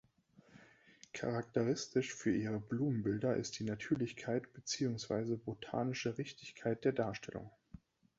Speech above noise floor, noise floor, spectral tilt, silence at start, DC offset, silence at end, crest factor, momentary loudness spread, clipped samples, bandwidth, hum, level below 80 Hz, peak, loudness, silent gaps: 29 dB; -67 dBFS; -6 dB/octave; 0.55 s; under 0.1%; 0.4 s; 18 dB; 8 LU; under 0.1%; 8 kHz; none; -68 dBFS; -20 dBFS; -39 LUFS; none